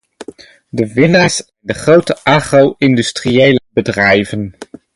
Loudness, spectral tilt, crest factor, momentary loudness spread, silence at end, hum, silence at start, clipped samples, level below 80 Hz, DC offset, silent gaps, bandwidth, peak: -12 LUFS; -5 dB/octave; 12 dB; 11 LU; 0.3 s; none; 0.2 s; under 0.1%; -44 dBFS; under 0.1%; none; 11.5 kHz; 0 dBFS